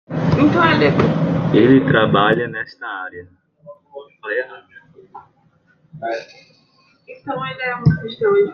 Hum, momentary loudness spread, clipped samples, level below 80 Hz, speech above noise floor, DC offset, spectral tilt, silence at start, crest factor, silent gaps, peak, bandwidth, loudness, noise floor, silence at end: none; 19 LU; under 0.1%; -50 dBFS; 40 dB; under 0.1%; -8 dB/octave; 0.1 s; 18 dB; none; -2 dBFS; 6.8 kHz; -17 LUFS; -57 dBFS; 0 s